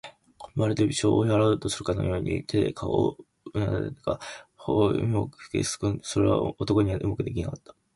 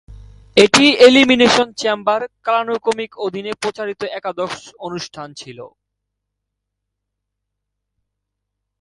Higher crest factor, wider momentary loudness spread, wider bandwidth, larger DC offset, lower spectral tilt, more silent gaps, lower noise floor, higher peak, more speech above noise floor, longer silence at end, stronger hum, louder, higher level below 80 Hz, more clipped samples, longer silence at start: about the same, 16 dB vs 18 dB; second, 11 LU vs 20 LU; about the same, 11.5 kHz vs 11.5 kHz; neither; first, -6 dB/octave vs -3 dB/octave; neither; second, -48 dBFS vs -78 dBFS; second, -10 dBFS vs 0 dBFS; second, 22 dB vs 62 dB; second, 0.4 s vs 3.15 s; second, none vs 50 Hz at -60 dBFS; second, -27 LUFS vs -15 LUFS; first, -46 dBFS vs -52 dBFS; neither; about the same, 0.05 s vs 0.1 s